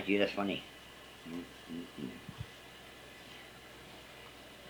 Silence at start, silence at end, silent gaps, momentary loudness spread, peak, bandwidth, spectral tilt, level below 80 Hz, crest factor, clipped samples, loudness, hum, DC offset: 0 s; 0 s; none; 18 LU; -16 dBFS; over 20 kHz; -5 dB/octave; -66 dBFS; 26 dB; under 0.1%; -42 LUFS; none; under 0.1%